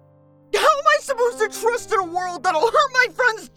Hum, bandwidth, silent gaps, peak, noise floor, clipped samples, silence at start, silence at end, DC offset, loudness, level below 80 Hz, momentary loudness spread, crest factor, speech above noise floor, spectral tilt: none; 17.5 kHz; none; -2 dBFS; -52 dBFS; under 0.1%; 0.55 s; 0.1 s; under 0.1%; -19 LUFS; -56 dBFS; 7 LU; 18 dB; 32 dB; -1.5 dB/octave